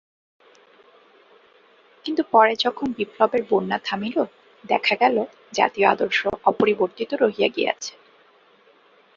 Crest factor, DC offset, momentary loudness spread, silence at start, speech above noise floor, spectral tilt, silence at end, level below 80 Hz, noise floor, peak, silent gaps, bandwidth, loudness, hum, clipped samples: 22 dB; under 0.1%; 9 LU; 2.05 s; 35 dB; -4 dB/octave; 1.25 s; -64 dBFS; -56 dBFS; -2 dBFS; none; 7.4 kHz; -21 LUFS; none; under 0.1%